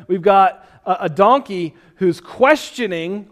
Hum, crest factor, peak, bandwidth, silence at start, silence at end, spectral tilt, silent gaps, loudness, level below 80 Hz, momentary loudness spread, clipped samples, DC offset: none; 16 dB; 0 dBFS; 14.5 kHz; 0.1 s; 0.05 s; -5.5 dB/octave; none; -17 LUFS; -58 dBFS; 12 LU; under 0.1%; under 0.1%